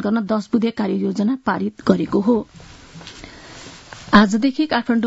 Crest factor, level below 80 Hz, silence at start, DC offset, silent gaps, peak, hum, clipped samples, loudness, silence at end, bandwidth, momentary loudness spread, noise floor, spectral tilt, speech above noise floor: 20 dB; -50 dBFS; 0 s; under 0.1%; none; 0 dBFS; none; under 0.1%; -18 LUFS; 0 s; 8 kHz; 23 LU; -39 dBFS; -6.5 dB/octave; 21 dB